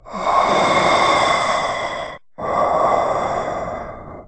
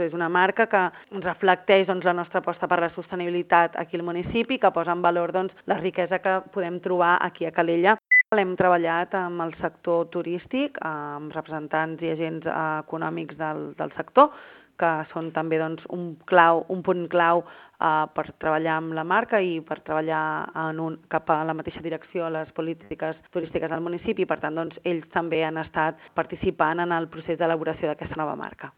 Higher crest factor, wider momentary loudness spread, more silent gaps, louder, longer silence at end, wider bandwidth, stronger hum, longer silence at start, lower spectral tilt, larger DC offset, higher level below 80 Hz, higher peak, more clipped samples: second, 16 dB vs 24 dB; first, 14 LU vs 11 LU; neither; first, -18 LUFS vs -25 LUFS; about the same, 0 s vs 0.1 s; first, 9.4 kHz vs 4.8 kHz; neither; about the same, 0.05 s vs 0 s; second, -3.5 dB/octave vs -9 dB/octave; neither; first, -44 dBFS vs -60 dBFS; about the same, -2 dBFS vs 0 dBFS; neither